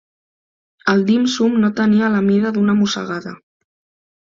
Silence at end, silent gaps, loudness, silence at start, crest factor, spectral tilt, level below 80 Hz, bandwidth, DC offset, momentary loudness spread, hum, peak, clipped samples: 0.9 s; none; -16 LUFS; 0.85 s; 16 dB; -6 dB/octave; -60 dBFS; 7.6 kHz; under 0.1%; 9 LU; none; -2 dBFS; under 0.1%